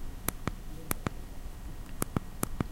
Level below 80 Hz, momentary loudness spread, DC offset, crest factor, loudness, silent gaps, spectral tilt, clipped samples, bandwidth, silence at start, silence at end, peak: -40 dBFS; 10 LU; under 0.1%; 32 dB; -38 LUFS; none; -4.5 dB/octave; under 0.1%; 17 kHz; 0 s; 0 s; -4 dBFS